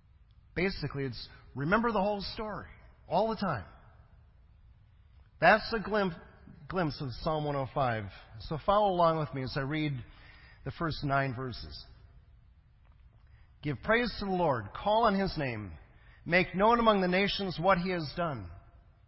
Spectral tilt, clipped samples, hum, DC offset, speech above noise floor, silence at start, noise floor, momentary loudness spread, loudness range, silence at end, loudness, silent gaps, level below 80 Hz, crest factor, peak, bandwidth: -9.5 dB/octave; under 0.1%; none; under 0.1%; 30 dB; 0.55 s; -60 dBFS; 17 LU; 8 LU; 0.5 s; -31 LUFS; none; -52 dBFS; 22 dB; -10 dBFS; 5.8 kHz